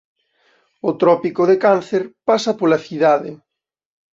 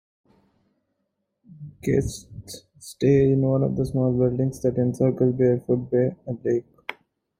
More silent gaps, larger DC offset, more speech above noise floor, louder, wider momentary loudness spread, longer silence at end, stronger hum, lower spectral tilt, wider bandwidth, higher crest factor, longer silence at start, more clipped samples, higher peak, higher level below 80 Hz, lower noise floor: neither; neither; second, 44 dB vs 55 dB; first, -17 LUFS vs -23 LUFS; second, 9 LU vs 20 LU; first, 0.8 s vs 0.45 s; neither; second, -6 dB/octave vs -8 dB/octave; second, 7.8 kHz vs 15 kHz; about the same, 16 dB vs 16 dB; second, 0.85 s vs 1.6 s; neither; first, -2 dBFS vs -8 dBFS; second, -64 dBFS vs -50 dBFS; second, -60 dBFS vs -77 dBFS